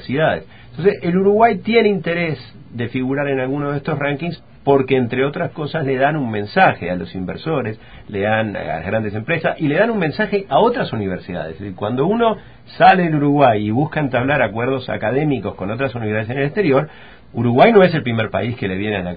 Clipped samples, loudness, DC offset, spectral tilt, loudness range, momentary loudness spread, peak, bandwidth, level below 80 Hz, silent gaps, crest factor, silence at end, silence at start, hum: under 0.1%; -18 LUFS; 0.5%; -10.5 dB/octave; 4 LU; 12 LU; 0 dBFS; 5 kHz; -46 dBFS; none; 18 dB; 0 s; 0 s; none